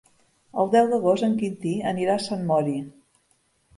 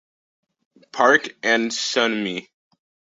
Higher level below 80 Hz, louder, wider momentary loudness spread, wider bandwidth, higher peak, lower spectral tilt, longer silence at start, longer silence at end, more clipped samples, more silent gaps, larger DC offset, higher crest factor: about the same, -68 dBFS vs -70 dBFS; second, -24 LUFS vs -20 LUFS; about the same, 11 LU vs 13 LU; first, 11.5 kHz vs 8 kHz; second, -8 dBFS vs -2 dBFS; first, -6.5 dB/octave vs -2.5 dB/octave; second, 0.55 s vs 0.95 s; about the same, 0.85 s vs 0.75 s; neither; neither; neither; about the same, 18 dB vs 22 dB